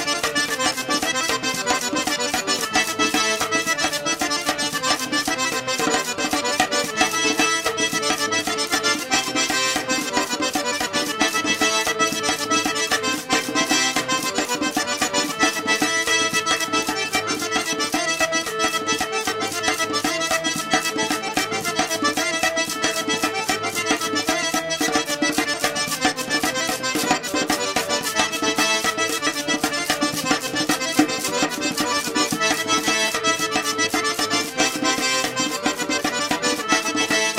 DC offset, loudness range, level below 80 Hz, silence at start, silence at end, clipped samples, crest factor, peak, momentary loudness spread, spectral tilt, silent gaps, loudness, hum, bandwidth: under 0.1%; 1 LU; -54 dBFS; 0 s; 0 s; under 0.1%; 20 dB; -2 dBFS; 3 LU; -1.5 dB/octave; none; -20 LUFS; none; 16 kHz